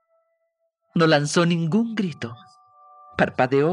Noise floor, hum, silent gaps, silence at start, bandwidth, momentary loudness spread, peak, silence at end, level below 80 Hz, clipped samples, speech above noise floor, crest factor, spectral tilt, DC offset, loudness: -74 dBFS; none; none; 0.95 s; 11 kHz; 15 LU; -4 dBFS; 0 s; -62 dBFS; under 0.1%; 53 dB; 20 dB; -5.5 dB/octave; under 0.1%; -21 LUFS